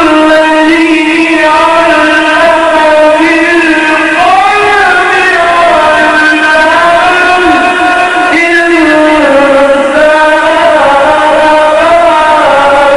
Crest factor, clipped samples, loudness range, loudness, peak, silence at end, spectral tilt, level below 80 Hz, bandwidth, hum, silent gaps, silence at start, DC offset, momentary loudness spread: 4 dB; 1%; 0 LU; -5 LUFS; 0 dBFS; 0 s; -3.5 dB/octave; -36 dBFS; 11 kHz; none; none; 0 s; 1%; 1 LU